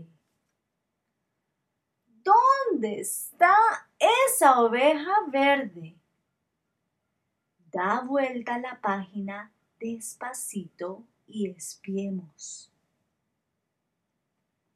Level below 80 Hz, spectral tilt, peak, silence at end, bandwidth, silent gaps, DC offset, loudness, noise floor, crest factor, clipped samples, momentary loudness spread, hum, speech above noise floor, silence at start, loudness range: -80 dBFS; -3.5 dB/octave; -4 dBFS; 2.15 s; 15.5 kHz; none; under 0.1%; -24 LUFS; -81 dBFS; 22 dB; under 0.1%; 19 LU; none; 55 dB; 0 s; 15 LU